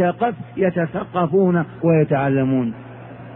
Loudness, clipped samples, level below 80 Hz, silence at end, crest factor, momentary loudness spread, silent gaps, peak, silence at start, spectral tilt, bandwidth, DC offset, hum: -19 LUFS; under 0.1%; -54 dBFS; 0 s; 14 dB; 11 LU; none; -6 dBFS; 0 s; -12.5 dB/octave; 3.8 kHz; under 0.1%; none